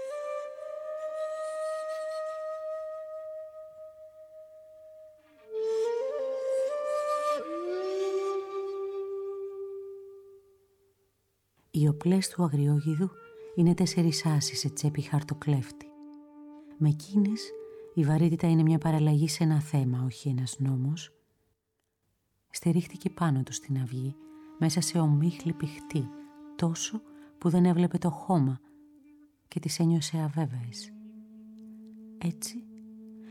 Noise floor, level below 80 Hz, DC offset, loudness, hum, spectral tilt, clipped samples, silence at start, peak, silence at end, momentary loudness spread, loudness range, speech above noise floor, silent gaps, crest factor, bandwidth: -80 dBFS; -68 dBFS; under 0.1%; -30 LUFS; none; -6.5 dB/octave; under 0.1%; 0 s; -14 dBFS; 0 s; 23 LU; 10 LU; 53 dB; none; 16 dB; 14.5 kHz